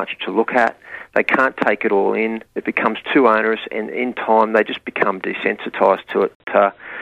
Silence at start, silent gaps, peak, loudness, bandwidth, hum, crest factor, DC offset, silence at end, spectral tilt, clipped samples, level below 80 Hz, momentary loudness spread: 0 s; 6.35-6.40 s; 0 dBFS; -18 LUFS; 8.8 kHz; none; 18 dB; under 0.1%; 0 s; -6.5 dB/octave; under 0.1%; -60 dBFS; 8 LU